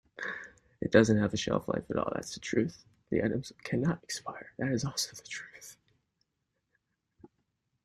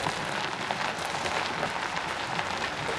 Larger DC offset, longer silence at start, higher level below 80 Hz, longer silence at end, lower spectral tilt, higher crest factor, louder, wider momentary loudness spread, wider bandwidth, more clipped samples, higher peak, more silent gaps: neither; first, 0.2 s vs 0 s; about the same, -62 dBFS vs -58 dBFS; first, 2.1 s vs 0 s; first, -5 dB/octave vs -3 dB/octave; first, 26 dB vs 20 dB; about the same, -32 LUFS vs -30 LUFS; first, 16 LU vs 2 LU; first, 13.5 kHz vs 12 kHz; neither; first, -6 dBFS vs -10 dBFS; neither